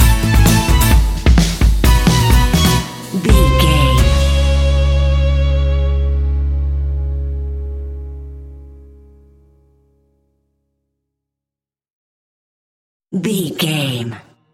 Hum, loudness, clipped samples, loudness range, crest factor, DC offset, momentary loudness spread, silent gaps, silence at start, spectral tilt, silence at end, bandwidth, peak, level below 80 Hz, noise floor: none; -15 LUFS; under 0.1%; 16 LU; 14 dB; under 0.1%; 14 LU; 11.92-13.00 s; 0 s; -5 dB/octave; 0.35 s; 17 kHz; 0 dBFS; -16 dBFS; -88 dBFS